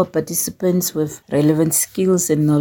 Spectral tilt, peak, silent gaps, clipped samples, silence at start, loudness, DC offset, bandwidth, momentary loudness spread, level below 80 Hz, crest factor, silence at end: -5.5 dB/octave; -2 dBFS; none; under 0.1%; 0 s; -18 LUFS; under 0.1%; 17 kHz; 5 LU; -56 dBFS; 16 dB; 0 s